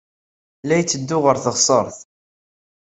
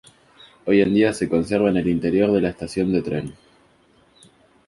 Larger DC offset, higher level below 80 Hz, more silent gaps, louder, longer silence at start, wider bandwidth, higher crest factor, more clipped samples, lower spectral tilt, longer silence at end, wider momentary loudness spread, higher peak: neither; second, -60 dBFS vs -48 dBFS; neither; about the same, -18 LUFS vs -20 LUFS; about the same, 0.65 s vs 0.65 s; second, 8.4 kHz vs 11.5 kHz; about the same, 20 dB vs 18 dB; neither; second, -3.5 dB/octave vs -7 dB/octave; second, 1 s vs 1.35 s; about the same, 9 LU vs 10 LU; about the same, -2 dBFS vs -4 dBFS